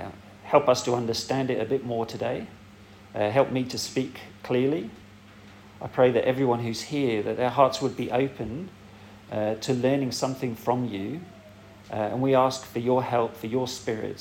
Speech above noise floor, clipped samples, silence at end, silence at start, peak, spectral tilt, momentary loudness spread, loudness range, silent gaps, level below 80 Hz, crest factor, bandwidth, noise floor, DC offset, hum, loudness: 23 dB; under 0.1%; 0 s; 0 s; -4 dBFS; -5.5 dB/octave; 14 LU; 4 LU; none; -60 dBFS; 22 dB; 17 kHz; -49 dBFS; under 0.1%; none; -26 LUFS